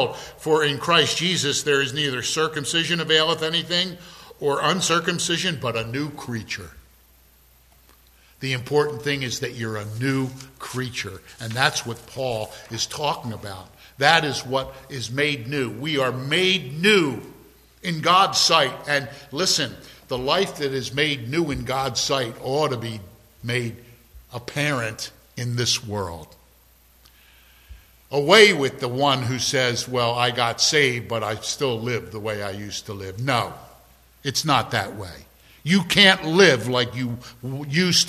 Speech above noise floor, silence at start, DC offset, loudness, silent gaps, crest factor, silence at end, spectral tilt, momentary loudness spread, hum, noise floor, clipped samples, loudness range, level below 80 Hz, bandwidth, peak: 33 dB; 0 s; under 0.1%; -21 LUFS; none; 24 dB; 0 s; -3.5 dB/octave; 16 LU; none; -55 dBFS; under 0.1%; 8 LU; -52 dBFS; 15 kHz; 0 dBFS